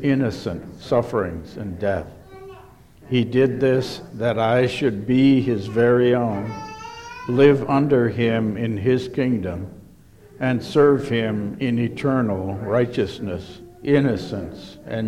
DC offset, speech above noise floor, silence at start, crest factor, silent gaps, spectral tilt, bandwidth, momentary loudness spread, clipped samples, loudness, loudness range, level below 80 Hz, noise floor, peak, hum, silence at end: under 0.1%; 27 dB; 0 s; 18 dB; none; -7.5 dB/octave; 12 kHz; 17 LU; under 0.1%; -21 LUFS; 5 LU; -50 dBFS; -47 dBFS; -2 dBFS; none; 0 s